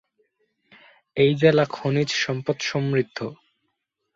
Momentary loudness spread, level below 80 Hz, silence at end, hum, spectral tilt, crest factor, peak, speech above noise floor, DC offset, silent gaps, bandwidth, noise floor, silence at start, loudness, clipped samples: 14 LU; -62 dBFS; 0.8 s; none; -5.5 dB/octave; 20 dB; -4 dBFS; 55 dB; under 0.1%; none; 7.8 kHz; -77 dBFS; 1.15 s; -22 LUFS; under 0.1%